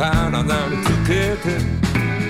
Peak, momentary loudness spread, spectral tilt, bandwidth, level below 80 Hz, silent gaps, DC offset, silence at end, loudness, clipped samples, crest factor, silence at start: -4 dBFS; 3 LU; -6 dB/octave; 16 kHz; -30 dBFS; none; under 0.1%; 0 s; -19 LUFS; under 0.1%; 14 dB; 0 s